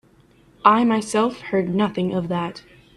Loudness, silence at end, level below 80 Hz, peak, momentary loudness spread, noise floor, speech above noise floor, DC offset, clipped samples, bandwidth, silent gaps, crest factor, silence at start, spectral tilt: -21 LUFS; 0.35 s; -58 dBFS; 0 dBFS; 9 LU; -54 dBFS; 34 dB; under 0.1%; under 0.1%; 12 kHz; none; 20 dB; 0.65 s; -6 dB/octave